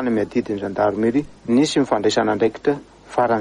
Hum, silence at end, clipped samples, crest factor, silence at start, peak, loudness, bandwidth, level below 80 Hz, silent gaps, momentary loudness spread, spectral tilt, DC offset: none; 0 s; under 0.1%; 14 dB; 0 s; -6 dBFS; -20 LUFS; 11 kHz; -52 dBFS; none; 6 LU; -5.5 dB/octave; under 0.1%